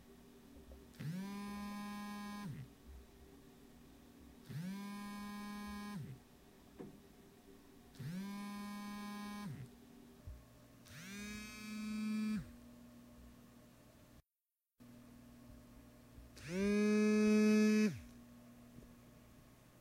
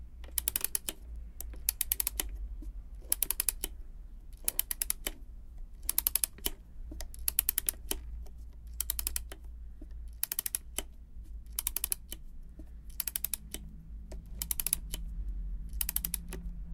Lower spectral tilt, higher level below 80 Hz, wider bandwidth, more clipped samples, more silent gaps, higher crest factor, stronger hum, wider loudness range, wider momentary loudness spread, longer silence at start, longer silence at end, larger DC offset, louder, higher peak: first, -6 dB/octave vs -1 dB/octave; second, -66 dBFS vs -44 dBFS; second, 16 kHz vs 18 kHz; neither; neither; second, 20 dB vs 32 dB; neither; first, 15 LU vs 4 LU; first, 28 LU vs 20 LU; about the same, 0 s vs 0 s; about the same, 0 s vs 0 s; neither; second, -40 LUFS vs -34 LUFS; second, -22 dBFS vs -6 dBFS